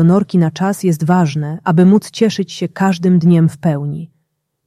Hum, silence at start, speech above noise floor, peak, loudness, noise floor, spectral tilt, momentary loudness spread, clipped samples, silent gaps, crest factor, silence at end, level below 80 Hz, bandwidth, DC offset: none; 0 s; 55 dB; -2 dBFS; -14 LUFS; -68 dBFS; -7.5 dB/octave; 10 LU; under 0.1%; none; 12 dB; 0.6 s; -56 dBFS; 13.5 kHz; under 0.1%